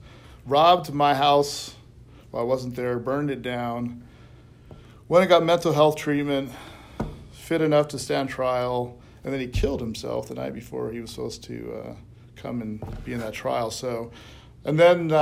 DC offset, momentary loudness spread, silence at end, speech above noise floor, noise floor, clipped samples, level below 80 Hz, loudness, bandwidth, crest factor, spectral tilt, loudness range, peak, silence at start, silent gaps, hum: under 0.1%; 18 LU; 0 s; 25 dB; -48 dBFS; under 0.1%; -44 dBFS; -24 LUFS; 16 kHz; 20 dB; -5.5 dB/octave; 9 LU; -4 dBFS; 0 s; none; none